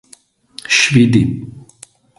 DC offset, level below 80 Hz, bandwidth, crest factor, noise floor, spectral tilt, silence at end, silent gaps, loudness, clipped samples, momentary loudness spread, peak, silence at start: under 0.1%; -44 dBFS; 11.5 kHz; 16 dB; -48 dBFS; -4.5 dB/octave; 0.6 s; none; -12 LUFS; under 0.1%; 22 LU; 0 dBFS; 0.7 s